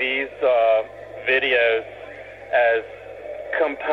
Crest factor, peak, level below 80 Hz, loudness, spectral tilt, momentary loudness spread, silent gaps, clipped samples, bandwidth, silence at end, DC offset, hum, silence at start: 14 dB; -8 dBFS; -58 dBFS; -20 LUFS; -5 dB/octave; 19 LU; none; under 0.1%; 5.8 kHz; 0 s; under 0.1%; 60 Hz at -60 dBFS; 0 s